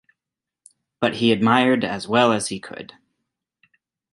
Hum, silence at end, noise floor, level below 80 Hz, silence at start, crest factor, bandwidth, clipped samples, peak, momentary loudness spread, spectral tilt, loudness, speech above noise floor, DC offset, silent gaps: none; 1.3 s; -87 dBFS; -62 dBFS; 1 s; 20 dB; 11.5 kHz; under 0.1%; -2 dBFS; 19 LU; -4.5 dB/octave; -19 LUFS; 67 dB; under 0.1%; none